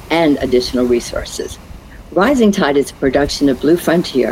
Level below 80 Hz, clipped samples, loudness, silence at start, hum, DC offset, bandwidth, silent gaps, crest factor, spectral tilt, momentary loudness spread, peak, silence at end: -36 dBFS; under 0.1%; -14 LUFS; 0 s; none; under 0.1%; 16 kHz; none; 14 dB; -5 dB/octave; 11 LU; 0 dBFS; 0 s